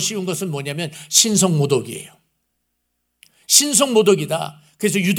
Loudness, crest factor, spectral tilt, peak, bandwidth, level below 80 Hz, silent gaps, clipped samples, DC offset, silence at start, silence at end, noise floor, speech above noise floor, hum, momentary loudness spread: -17 LUFS; 20 dB; -3 dB/octave; 0 dBFS; over 20 kHz; -68 dBFS; none; under 0.1%; under 0.1%; 0 s; 0 s; -72 dBFS; 54 dB; none; 14 LU